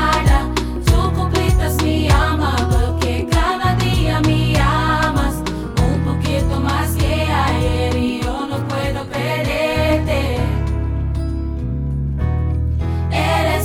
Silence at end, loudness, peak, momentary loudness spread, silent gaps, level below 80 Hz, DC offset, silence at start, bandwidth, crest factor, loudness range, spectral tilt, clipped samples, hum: 0 s; -18 LUFS; -2 dBFS; 6 LU; none; -22 dBFS; under 0.1%; 0 s; 16.5 kHz; 16 dB; 3 LU; -6 dB/octave; under 0.1%; none